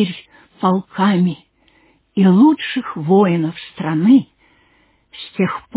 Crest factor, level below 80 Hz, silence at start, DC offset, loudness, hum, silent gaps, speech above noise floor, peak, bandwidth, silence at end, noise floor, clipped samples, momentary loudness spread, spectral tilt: 14 dB; -62 dBFS; 0 s; under 0.1%; -16 LUFS; none; none; 42 dB; -2 dBFS; 4 kHz; 0.15 s; -57 dBFS; under 0.1%; 14 LU; -11.5 dB/octave